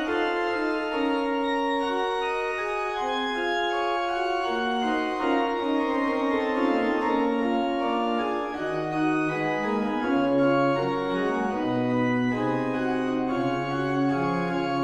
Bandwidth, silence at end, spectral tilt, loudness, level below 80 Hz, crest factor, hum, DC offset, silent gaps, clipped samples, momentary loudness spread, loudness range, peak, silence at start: 9.4 kHz; 0 s; -6.5 dB/octave; -26 LUFS; -54 dBFS; 14 dB; none; under 0.1%; none; under 0.1%; 3 LU; 2 LU; -12 dBFS; 0 s